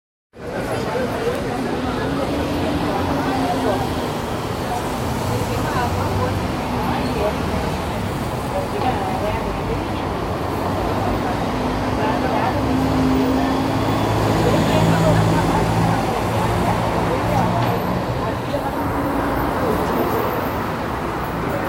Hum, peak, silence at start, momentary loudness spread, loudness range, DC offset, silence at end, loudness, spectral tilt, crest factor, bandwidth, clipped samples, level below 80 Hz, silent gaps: none; -4 dBFS; 0.35 s; 6 LU; 4 LU; under 0.1%; 0 s; -20 LUFS; -6 dB/octave; 16 dB; 16 kHz; under 0.1%; -34 dBFS; none